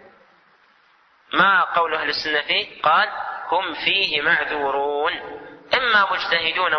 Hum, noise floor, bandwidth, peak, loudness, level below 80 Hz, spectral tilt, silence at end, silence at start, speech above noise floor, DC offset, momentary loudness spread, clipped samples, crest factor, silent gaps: none; -57 dBFS; 6.4 kHz; -4 dBFS; -19 LUFS; -60 dBFS; -3.5 dB/octave; 0 s; 1.3 s; 37 dB; under 0.1%; 8 LU; under 0.1%; 18 dB; none